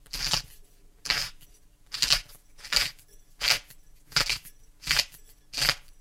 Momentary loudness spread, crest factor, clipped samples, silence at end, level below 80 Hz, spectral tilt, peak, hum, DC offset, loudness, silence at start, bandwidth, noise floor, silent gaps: 14 LU; 28 dB; under 0.1%; 0.1 s; -46 dBFS; 0 dB/octave; -4 dBFS; none; under 0.1%; -27 LUFS; 0.15 s; 17 kHz; -54 dBFS; none